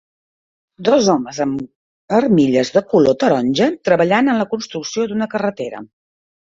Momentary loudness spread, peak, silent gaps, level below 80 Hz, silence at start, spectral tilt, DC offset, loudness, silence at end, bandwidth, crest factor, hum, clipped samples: 10 LU; -2 dBFS; 1.75-2.08 s; -56 dBFS; 0.8 s; -5.5 dB/octave; under 0.1%; -16 LUFS; 0.65 s; 7.8 kHz; 16 dB; none; under 0.1%